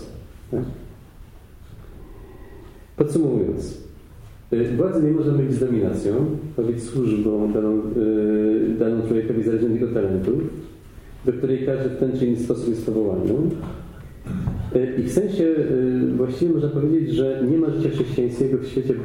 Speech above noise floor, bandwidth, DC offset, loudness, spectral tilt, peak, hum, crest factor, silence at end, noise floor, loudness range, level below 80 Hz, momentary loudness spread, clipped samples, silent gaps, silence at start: 23 dB; 12.5 kHz; under 0.1%; -22 LUFS; -8.5 dB/octave; -4 dBFS; none; 18 dB; 0 s; -43 dBFS; 6 LU; -42 dBFS; 10 LU; under 0.1%; none; 0 s